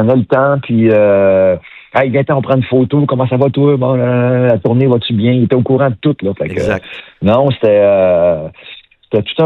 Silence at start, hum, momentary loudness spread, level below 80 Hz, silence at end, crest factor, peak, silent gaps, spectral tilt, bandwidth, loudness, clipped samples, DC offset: 0 s; none; 8 LU; -48 dBFS; 0 s; 12 dB; 0 dBFS; none; -9 dB/octave; 7 kHz; -12 LUFS; under 0.1%; under 0.1%